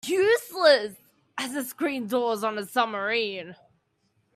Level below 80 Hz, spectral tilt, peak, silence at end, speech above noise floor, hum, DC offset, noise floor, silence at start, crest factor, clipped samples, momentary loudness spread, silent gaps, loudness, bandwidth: -76 dBFS; -3 dB/octave; -6 dBFS; 0.8 s; 46 dB; none; under 0.1%; -71 dBFS; 0.05 s; 20 dB; under 0.1%; 16 LU; none; -25 LUFS; 15.5 kHz